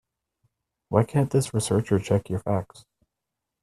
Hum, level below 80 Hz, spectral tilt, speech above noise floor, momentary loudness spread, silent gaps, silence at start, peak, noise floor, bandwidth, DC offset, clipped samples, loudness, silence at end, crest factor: none; -56 dBFS; -6.5 dB/octave; 61 dB; 6 LU; none; 0.9 s; -4 dBFS; -85 dBFS; 13 kHz; under 0.1%; under 0.1%; -25 LUFS; 1 s; 22 dB